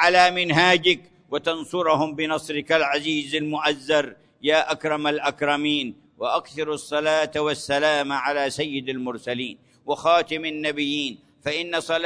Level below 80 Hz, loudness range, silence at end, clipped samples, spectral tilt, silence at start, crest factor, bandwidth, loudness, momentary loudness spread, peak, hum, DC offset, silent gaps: -64 dBFS; 3 LU; 0 s; under 0.1%; -4 dB/octave; 0 s; 18 dB; 11 kHz; -23 LUFS; 11 LU; -4 dBFS; none; under 0.1%; none